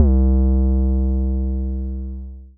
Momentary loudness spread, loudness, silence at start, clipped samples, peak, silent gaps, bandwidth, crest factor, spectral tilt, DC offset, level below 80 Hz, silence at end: 13 LU; -20 LUFS; 0 s; under 0.1%; -4 dBFS; none; 1.4 kHz; 14 dB; -16 dB/octave; under 0.1%; -18 dBFS; 0.1 s